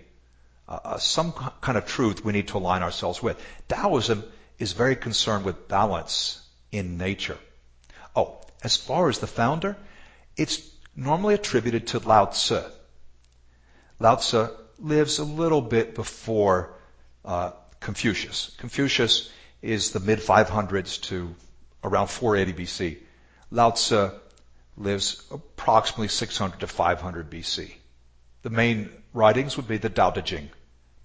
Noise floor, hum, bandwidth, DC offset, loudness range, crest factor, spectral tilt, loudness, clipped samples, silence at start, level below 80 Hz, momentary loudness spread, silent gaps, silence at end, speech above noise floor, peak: -56 dBFS; none; 8 kHz; under 0.1%; 3 LU; 24 dB; -4 dB/octave; -25 LUFS; under 0.1%; 0.7 s; -48 dBFS; 14 LU; none; 0.55 s; 31 dB; -2 dBFS